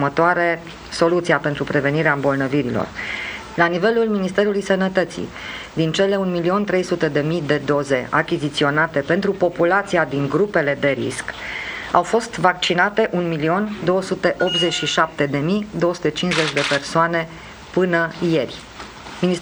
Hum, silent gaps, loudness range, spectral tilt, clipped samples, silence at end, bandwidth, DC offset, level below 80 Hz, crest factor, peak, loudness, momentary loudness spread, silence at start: none; none; 1 LU; -5 dB/octave; under 0.1%; 0 s; over 20 kHz; under 0.1%; -50 dBFS; 18 dB; 0 dBFS; -19 LUFS; 9 LU; 0 s